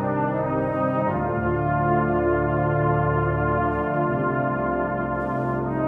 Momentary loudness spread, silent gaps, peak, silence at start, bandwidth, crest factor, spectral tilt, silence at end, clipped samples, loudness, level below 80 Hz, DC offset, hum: 4 LU; none; -10 dBFS; 0 s; 3.7 kHz; 14 dB; -11 dB/octave; 0 s; under 0.1%; -23 LUFS; -40 dBFS; under 0.1%; none